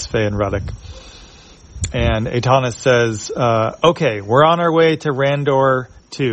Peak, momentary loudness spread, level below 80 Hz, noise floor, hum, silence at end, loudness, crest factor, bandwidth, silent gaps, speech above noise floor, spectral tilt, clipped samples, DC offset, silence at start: 0 dBFS; 12 LU; -36 dBFS; -42 dBFS; none; 0 s; -16 LUFS; 16 dB; 8.6 kHz; none; 26 dB; -5.5 dB/octave; under 0.1%; under 0.1%; 0 s